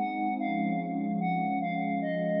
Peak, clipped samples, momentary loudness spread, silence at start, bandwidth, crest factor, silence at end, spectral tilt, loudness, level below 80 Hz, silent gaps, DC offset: -18 dBFS; under 0.1%; 1 LU; 0 s; 5.2 kHz; 12 dB; 0 s; -6.5 dB/octave; -30 LUFS; -88 dBFS; none; under 0.1%